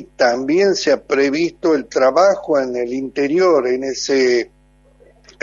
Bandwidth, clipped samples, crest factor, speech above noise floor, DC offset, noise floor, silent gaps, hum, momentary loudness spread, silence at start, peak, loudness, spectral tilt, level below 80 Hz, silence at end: 7.6 kHz; under 0.1%; 14 dB; 36 dB; under 0.1%; -52 dBFS; none; none; 7 LU; 0 s; -2 dBFS; -16 LUFS; -4 dB/octave; -54 dBFS; 0.95 s